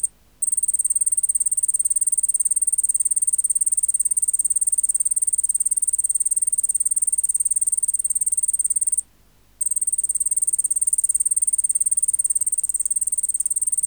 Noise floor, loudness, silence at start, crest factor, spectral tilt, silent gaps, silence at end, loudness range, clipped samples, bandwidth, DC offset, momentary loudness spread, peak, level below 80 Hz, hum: -56 dBFS; -18 LUFS; 0.05 s; 14 dB; 1.5 dB/octave; none; 0 s; 2 LU; under 0.1%; over 20 kHz; 0.1%; 2 LU; -8 dBFS; -60 dBFS; 50 Hz at -60 dBFS